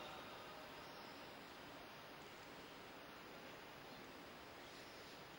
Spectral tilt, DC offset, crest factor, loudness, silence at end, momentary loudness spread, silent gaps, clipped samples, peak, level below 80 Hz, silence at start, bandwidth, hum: -3.5 dB/octave; under 0.1%; 16 dB; -56 LUFS; 0 s; 2 LU; none; under 0.1%; -40 dBFS; -78 dBFS; 0 s; 16 kHz; none